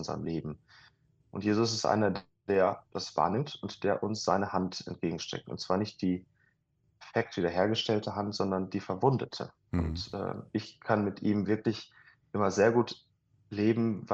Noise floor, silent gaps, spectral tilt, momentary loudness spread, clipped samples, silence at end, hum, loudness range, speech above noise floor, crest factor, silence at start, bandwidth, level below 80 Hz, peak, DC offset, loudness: -73 dBFS; none; -5.5 dB/octave; 10 LU; under 0.1%; 0 s; none; 3 LU; 43 dB; 20 dB; 0 s; 8.2 kHz; -56 dBFS; -12 dBFS; under 0.1%; -31 LUFS